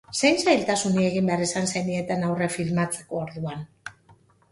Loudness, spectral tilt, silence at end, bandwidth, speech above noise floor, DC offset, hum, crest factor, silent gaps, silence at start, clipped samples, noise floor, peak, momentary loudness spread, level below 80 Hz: -24 LUFS; -4.5 dB/octave; 0.6 s; 11.5 kHz; 33 dB; under 0.1%; none; 18 dB; none; 0.1 s; under 0.1%; -57 dBFS; -6 dBFS; 14 LU; -60 dBFS